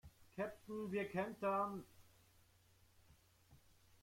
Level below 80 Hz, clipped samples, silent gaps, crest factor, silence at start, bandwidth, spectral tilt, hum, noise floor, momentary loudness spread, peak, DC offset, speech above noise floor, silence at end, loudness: -76 dBFS; under 0.1%; none; 18 dB; 0.05 s; 16.5 kHz; -6.5 dB/octave; none; -72 dBFS; 10 LU; -28 dBFS; under 0.1%; 29 dB; 0.45 s; -44 LUFS